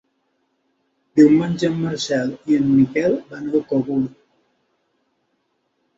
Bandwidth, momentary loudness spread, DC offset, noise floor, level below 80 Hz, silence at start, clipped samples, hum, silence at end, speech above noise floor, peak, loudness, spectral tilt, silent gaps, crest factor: 7.8 kHz; 9 LU; under 0.1%; -69 dBFS; -58 dBFS; 1.15 s; under 0.1%; none; 1.9 s; 52 dB; -2 dBFS; -19 LUFS; -6.5 dB/octave; none; 18 dB